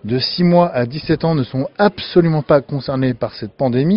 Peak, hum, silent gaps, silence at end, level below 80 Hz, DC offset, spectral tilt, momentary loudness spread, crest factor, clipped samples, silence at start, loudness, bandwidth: 0 dBFS; none; none; 0 s; -46 dBFS; under 0.1%; -6 dB/octave; 8 LU; 16 dB; under 0.1%; 0.05 s; -17 LUFS; 5.6 kHz